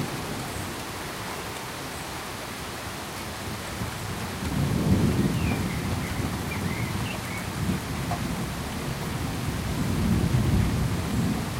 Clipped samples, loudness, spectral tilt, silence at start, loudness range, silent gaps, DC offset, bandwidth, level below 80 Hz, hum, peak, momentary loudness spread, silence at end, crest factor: under 0.1%; -29 LUFS; -5.5 dB/octave; 0 s; 6 LU; none; under 0.1%; 16 kHz; -38 dBFS; none; -10 dBFS; 10 LU; 0 s; 18 dB